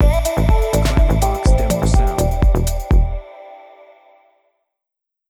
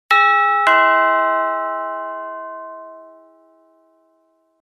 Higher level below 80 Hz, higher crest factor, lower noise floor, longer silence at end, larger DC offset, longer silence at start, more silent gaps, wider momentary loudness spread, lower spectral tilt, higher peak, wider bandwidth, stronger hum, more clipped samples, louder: first, -18 dBFS vs -78 dBFS; about the same, 16 dB vs 16 dB; first, -76 dBFS vs -62 dBFS; about the same, 1.7 s vs 1.6 s; neither; about the same, 0 s vs 0.1 s; neither; second, 7 LU vs 20 LU; first, -6 dB/octave vs -1 dB/octave; first, 0 dBFS vs -4 dBFS; first, 18.5 kHz vs 12.5 kHz; neither; neither; about the same, -17 LUFS vs -15 LUFS